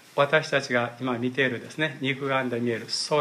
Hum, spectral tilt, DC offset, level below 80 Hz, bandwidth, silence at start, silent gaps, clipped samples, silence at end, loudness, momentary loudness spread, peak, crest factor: none; -4.5 dB/octave; under 0.1%; -74 dBFS; 14.5 kHz; 0.15 s; none; under 0.1%; 0 s; -26 LUFS; 6 LU; -6 dBFS; 20 dB